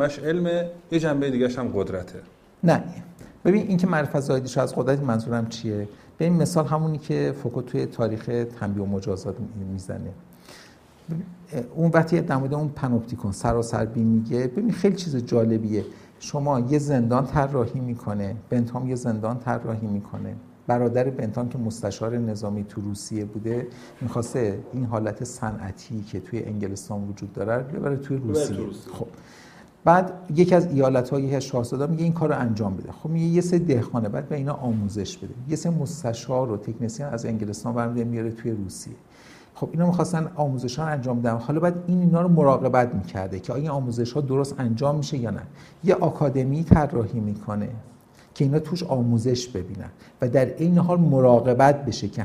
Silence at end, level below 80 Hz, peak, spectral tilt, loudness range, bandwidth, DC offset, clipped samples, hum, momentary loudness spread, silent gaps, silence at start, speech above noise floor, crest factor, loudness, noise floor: 0 s; -50 dBFS; 0 dBFS; -7.5 dB/octave; 7 LU; 13 kHz; under 0.1%; under 0.1%; none; 13 LU; none; 0 s; 26 dB; 22 dB; -24 LUFS; -50 dBFS